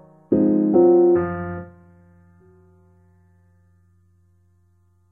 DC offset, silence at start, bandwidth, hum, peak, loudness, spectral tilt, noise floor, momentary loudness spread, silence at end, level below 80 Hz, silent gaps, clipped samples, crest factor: under 0.1%; 0.3 s; 2.4 kHz; none; -4 dBFS; -18 LUFS; -13 dB/octave; -60 dBFS; 17 LU; 3.45 s; -60 dBFS; none; under 0.1%; 18 dB